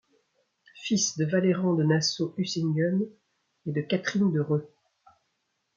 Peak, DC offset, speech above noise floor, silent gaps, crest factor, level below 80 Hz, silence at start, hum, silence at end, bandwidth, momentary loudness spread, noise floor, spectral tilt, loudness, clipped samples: -12 dBFS; under 0.1%; 51 dB; none; 16 dB; -72 dBFS; 0.75 s; none; 1.1 s; 7.4 kHz; 9 LU; -77 dBFS; -5 dB/octave; -27 LUFS; under 0.1%